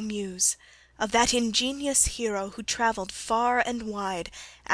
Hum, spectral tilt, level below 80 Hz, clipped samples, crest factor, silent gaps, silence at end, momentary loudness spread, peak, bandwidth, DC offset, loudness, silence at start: none; -1.5 dB/octave; -48 dBFS; under 0.1%; 20 dB; none; 0 s; 11 LU; -8 dBFS; 11 kHz; under 0.1%; -26 LUFS; 0 s